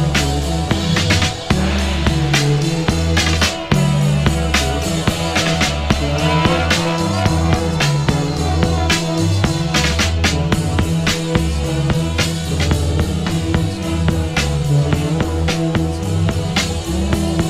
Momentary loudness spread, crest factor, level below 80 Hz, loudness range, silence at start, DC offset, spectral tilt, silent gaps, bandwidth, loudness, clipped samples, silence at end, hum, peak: 4 LU; 16 dB; -24 dBFS; 2 LU; 0 s; under 0.1%; -5 dB/octave; none; 15.5 kHz; -17 LUFS; under 0.1%; 0 s; none; 0 dBFS